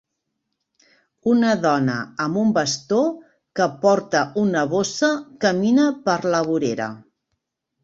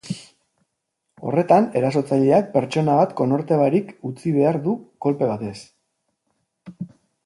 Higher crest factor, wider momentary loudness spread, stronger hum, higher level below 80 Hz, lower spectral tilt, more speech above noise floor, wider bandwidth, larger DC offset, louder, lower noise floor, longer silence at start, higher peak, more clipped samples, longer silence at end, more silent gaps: about the same, 18 dB vs 20 dB; second, 7 LU vs 17 LU; neither; about the same, -62 dBFS vs -64 dBFS; second, -5 dB/octave vs -8 dB/octave; about the same, 58 dB vs 58 dB; second, 8 kHz vs 11.5 kHz; neither; about the same, -20 LUFS vs -20 LUFS; about the same, -77 dBFS vs -77 dBFS; first, 1.25 s vs 0.05 s; about the same, -4 dBFS vs -2 dBFS; neither; first, 0.85 s vs 0.4 s; neither